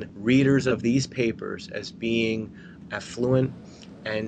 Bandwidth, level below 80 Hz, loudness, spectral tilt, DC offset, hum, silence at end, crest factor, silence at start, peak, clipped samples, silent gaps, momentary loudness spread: 9.2 kHz; -56 dBFS; -25 LUFS; -6 dB/octave; under 0.1%; none; 0 s; 16 dB; 0 s; -10 dBFS; under 0.1%; none; 16 LU